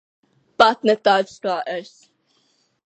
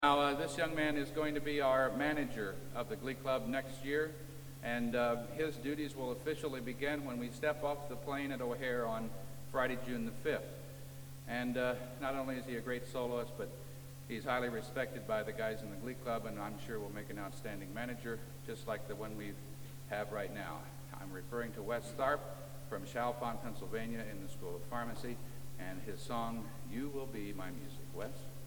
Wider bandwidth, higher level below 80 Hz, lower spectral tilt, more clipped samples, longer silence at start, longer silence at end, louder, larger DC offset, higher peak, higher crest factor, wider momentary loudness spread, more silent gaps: second, 8.8 kHz vs 19.5 kHz; second, -66 dBFS vs -58 dBFS; second, -4 dB/octave vs -5.5 dB/octave; neither; first, 0.6 s vs 0 s; first, 1.05 s vs 0 s; first, -19 LUFS vs -40 LUFS; neither; first, 0 dBFS vs -16 dBFS; about the same, 22 dB vs 24 dB; first, 15 LU vs 12 LU; neither